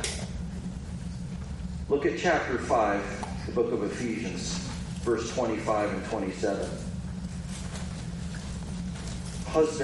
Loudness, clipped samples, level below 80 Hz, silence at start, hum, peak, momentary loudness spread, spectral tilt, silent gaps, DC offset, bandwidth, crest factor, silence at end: -31 LUFS; under 0.1%; -44 dBFS; 0 s; none; -10 dBFS; 11 LU; -5 dB/octave; none; under 0.1%; 11.5 kHz; 20 dB; 0 s